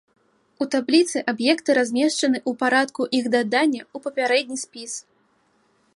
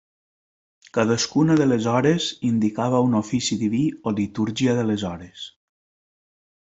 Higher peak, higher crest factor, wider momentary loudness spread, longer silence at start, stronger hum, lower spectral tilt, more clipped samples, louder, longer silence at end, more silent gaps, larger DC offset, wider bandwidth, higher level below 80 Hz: about the same, -4 dBFS vs -4 dBFS; about the same, 18 dB vs 18 dB; about the same, 12 LU vs 10 LU; second, 0.6 s vs 0.95 s; neither; second, -2.5 dB/octave vs -5.5 dB/octave; neither; about the same, -21 LUFS vs -22 LUFS; second, 0.95 s vs 1.3 s; neither; neither; first, 11.5 kHz vs 8.2 kHz; second, -76 dBFS vs -58 dBFS